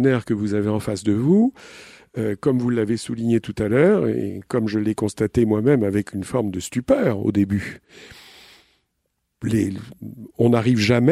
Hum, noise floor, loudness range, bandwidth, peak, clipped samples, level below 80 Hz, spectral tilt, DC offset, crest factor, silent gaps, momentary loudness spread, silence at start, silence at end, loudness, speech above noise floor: none; -74 dBFS; 5 LU; 14 kHz; -2 dBFS; under 0.1%; -50 dBFS; -7 dB/octave; under 0.1%; 18 dB; none; 13 LU; 0 s; 0 s; -21 LUFS; 54 dB